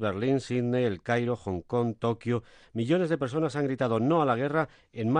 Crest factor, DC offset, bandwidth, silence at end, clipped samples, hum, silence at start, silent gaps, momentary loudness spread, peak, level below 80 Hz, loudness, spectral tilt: 14 dB; under 0.1%; 10 kHz; 0 s; under 0.1%; none; 0 s; none; 8 LU; -12 dBFS; -62 dBFS; -28 LUFS; -7.5 dB/octave